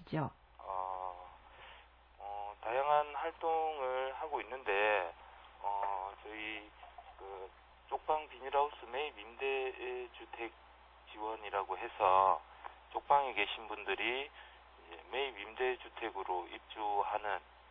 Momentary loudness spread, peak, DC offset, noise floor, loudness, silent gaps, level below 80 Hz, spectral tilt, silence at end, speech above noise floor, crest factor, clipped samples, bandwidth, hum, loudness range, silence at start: 21 LU; -14 dBFS; under 0.1%; -60 dBFS; -37 LUFS; none; -66 dBFS; -7 dB/octave; 0.05 s; 23 dB; 24 dB; under 0.1%; 5.4 kHz; none; 6 LU; 0 s